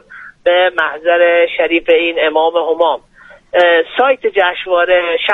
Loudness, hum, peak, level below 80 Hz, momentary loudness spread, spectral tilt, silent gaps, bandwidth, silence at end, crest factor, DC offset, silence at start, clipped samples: -12 LUFS; none; 0 dBFS; -52 dBFS; 4 LU; -4 dB/octave; none; 4.1 kHz; 0 s; 12 dB; under 0.1%; 0.1 s; under 0.1%